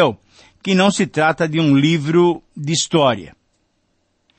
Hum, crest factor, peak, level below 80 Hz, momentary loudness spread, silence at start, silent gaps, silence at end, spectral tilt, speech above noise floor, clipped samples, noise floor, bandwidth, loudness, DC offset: none; 16 dB; -2 dBFS; -56 dBFS; 11 LU; 0 s; none; 1.1 s; -5 dB/octave; 50 dB; under 0.1%; -66 dBFS; 8.8 kHz; -16 LUFS; under 0.1%